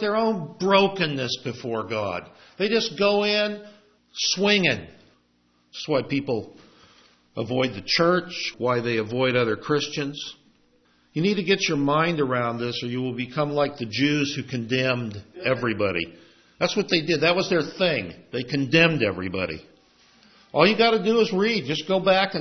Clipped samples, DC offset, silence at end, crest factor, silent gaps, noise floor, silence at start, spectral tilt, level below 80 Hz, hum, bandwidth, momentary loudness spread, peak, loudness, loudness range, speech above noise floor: under 0.1%; under 0.1%; 0 s; 20 dB; none; -65 dBFS; 0 s; -5 dB/octave; -62 dBFS; none; 6.4 kHz; 11 LU; -4 dBFS; -23 LUFS; 3 LU; 41 dB